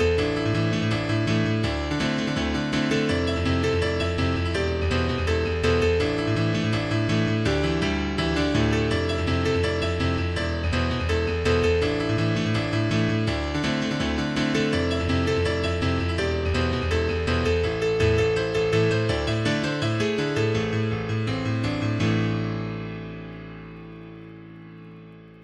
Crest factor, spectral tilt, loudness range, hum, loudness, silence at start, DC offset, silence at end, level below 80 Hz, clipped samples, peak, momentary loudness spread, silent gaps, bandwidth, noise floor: 14 dB; -6 dB/octave; 3 LU; none; -24 LUFS; 0 s; under 0.1%; 0.05 s; -36 dBFS; under 0.1%; -10 dBFS; 6 LU; none; 11.5 kHz; -45 dBFS